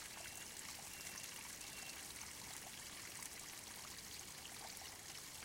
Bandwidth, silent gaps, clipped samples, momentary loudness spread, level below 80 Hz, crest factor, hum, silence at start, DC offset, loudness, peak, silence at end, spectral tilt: 17 kHz; none; under 0.1%; 2 LU; -72 dBFS; 22 dB; none; 0 s; under 0.1%; -50 LUFS; -30 dBFS; 0 s; -0.5 dB/octave